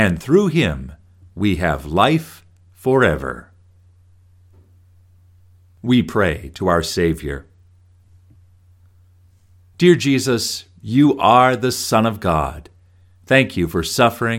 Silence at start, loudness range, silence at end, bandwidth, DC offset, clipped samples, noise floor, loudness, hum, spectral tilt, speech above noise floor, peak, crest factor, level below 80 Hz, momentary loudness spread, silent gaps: 0 s; 8 LU; 0 s; 17 kHz; under 0.1%; under 0.1%; -52 dBFS; -17 LUFS; none; -5.5 dB/octave; 35 dB; 0 dBFS; 20 dB; -40 dBFS; 15 LU; none